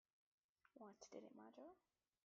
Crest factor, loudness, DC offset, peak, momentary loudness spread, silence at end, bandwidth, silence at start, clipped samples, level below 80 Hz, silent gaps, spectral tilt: 22 dB; -63 LUFS; under 0.1%; -44 dBFS; 5 LU; 0.45 s; 7.2 kHz; 0.65 s; under 0.1%; under -90 dBFS; none; -4.5 dB/octave